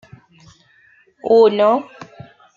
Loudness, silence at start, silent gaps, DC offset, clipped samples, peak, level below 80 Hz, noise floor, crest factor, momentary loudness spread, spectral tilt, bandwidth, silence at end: -14 LUFS; 1.25 s; none; under 0.1%; under 0.1%; -2 dBFS; -66 dBFS; -53 dBFS; 16 dB; 25 LU; -6.5 dB/octave; 7.2 kHz; 0.5 s